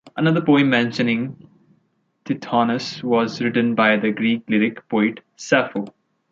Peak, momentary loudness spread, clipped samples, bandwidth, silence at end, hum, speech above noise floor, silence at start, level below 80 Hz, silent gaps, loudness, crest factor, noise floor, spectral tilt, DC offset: -2 dBFS; 12 LU; under 0.1%; 7.6 kHz; 0.4 s; none; 47 dB; 0.05 s; -66 dBFS; none; -20 LUFS; 18 dB; -66 dBFS; -6 dB/octave; under 0.1%